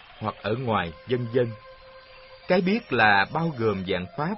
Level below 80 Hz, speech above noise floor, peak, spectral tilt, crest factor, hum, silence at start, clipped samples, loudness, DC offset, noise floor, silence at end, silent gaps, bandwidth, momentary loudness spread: -56 dBFS; 23 dB; -4 dBFS; -10 dB/octave; 20 dB; none; 0.1 s; under 0.1%; -25 LUFS; under 0.1%; -48 dBFS; 0 s; none; 5.8 kHz; 11 LU